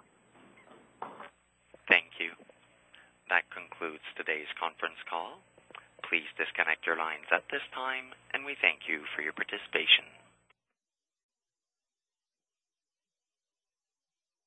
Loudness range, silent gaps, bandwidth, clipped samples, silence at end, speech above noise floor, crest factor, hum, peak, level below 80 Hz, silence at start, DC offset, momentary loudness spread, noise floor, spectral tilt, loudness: 6 LU; none; 8.6 kHz; under 0.1%; 4.4 s; over 57 dB; 30 dB; none; -6 dBFS; -82 dBFS; 0.7 s; under 0.1%; 20 LU; under -90 dBFS; -2.5 dB/octave; -30 LUFS